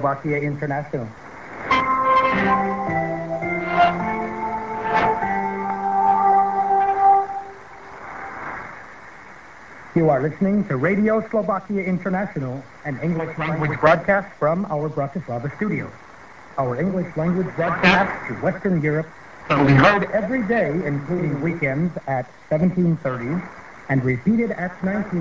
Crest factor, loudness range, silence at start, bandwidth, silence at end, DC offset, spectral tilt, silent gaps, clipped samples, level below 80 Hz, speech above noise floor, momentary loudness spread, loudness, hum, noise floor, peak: 22 dB; 4 LU; 0 s; 7.6 kHz; 0 s; 0.3%; -7.5 dB/octave; none; under 0.1%; -50 dBFS; 22 dB; 17 LU; -21 LUFS; none; -43 dBFS; 0 dBFS